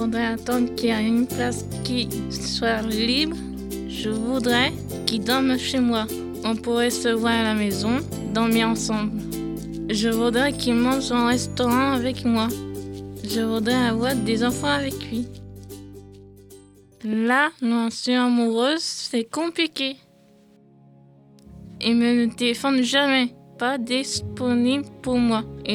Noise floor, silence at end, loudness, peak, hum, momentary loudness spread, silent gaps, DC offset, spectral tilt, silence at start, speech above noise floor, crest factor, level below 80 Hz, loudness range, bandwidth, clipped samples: -54 dBFS; 0 s; -22 LUFS; -2 dBFS; none; 10 LU; none; under 0.1%; -4 dB/octave; 0 s; 32 dB; 22 dB; -46 dBFS; 4 LU; 17.5 kHz; under 0.1%